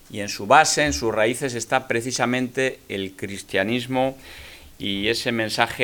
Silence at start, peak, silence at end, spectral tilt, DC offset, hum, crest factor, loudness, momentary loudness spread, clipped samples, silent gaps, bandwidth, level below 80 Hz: 0.1 s; 0 dBFS; 0 s; -3.5 dB/octave; under 0.1%; none; 22 dB; -22 LUFS; 14 LU; under 0.1%; none; 19 kHz; -48 dBFS